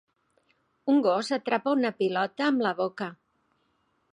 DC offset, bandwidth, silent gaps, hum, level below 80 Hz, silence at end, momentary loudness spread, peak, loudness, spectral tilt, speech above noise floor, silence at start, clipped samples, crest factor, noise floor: under 0.1%; 11 kHz; none; none; -82 dBFS; 1 s; 10 LU; -8 dBFS; -27 LUFS; -5.5 dB/octave; 46 dB; 0.85 s; under 0.1%; 20 dB; -72 dBFS